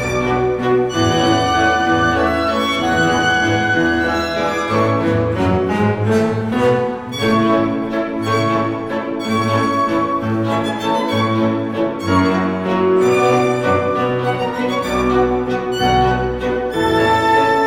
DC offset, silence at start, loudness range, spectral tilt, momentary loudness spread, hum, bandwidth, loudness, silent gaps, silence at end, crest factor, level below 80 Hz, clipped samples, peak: under 0.1%; 0 s; 3 LU; -5.5 dB/octave; 5 LU; none; 16.5 kHz; -16 LUFS; none; 0 s; 14 dB; -38 dBFS; under 0.1%; -2 dBFS